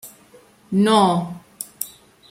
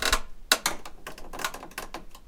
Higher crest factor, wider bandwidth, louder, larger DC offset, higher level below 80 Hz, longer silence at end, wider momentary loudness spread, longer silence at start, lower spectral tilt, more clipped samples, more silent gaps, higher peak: second, 18 dB vs 28 dB; second, 16.5 kHz vs 19 kHz; first, -19 LUFS vs -29 LUFS; neither; second, -62 dBFS vs -40 dBFS; first, 0.4 s vs 0 s; about the same, 18 LU vs 18 LU; about the same, 0.05 s vs 0 s; first, -5 dB/octave vs -0.5 dB/octave; neither; neither; about the same, -4 dBFS vs -2 dBFS